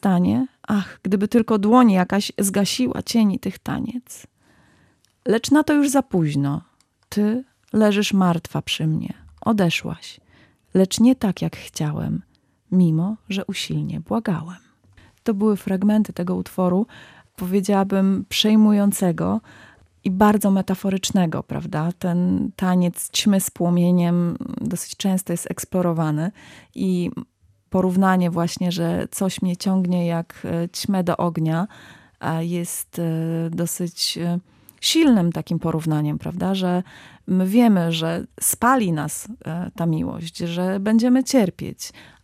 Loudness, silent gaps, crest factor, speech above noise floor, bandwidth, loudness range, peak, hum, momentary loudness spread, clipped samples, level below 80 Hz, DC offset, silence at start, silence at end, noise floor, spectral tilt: -21 LUFS; none; 18 dB; 39 dB; 15.5 kHz; 5 LU; -2 dBFS; none; 11 LU; under 0.1%; -56 dBFS; under 0.1%; 0.05 s; 0.2 s; -60 dBFS; -5.5 dB/octave